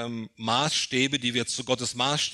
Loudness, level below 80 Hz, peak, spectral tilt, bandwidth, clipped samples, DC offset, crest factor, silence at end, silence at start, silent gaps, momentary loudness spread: -26 LUFS; -66 dBFS; -8 dBFS; -3 dB/octave; 13 kHz; under 0.1%; under 0.1%; 20 dB; 0 s; 0 s; none; 5 LU